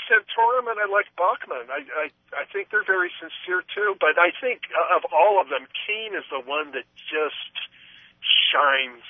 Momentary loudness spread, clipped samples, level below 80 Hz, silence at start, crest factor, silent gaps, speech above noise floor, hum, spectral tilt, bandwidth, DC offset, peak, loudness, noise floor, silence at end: 12 LU; under 0.1%; -78 dBFS; 0 s; 20 dB; none; 23 dB; none; -4 dB/octave; 3.8 kHz; under 0.1%; -4 dBFS; -23 LUFS; -47 dBFS; 0 s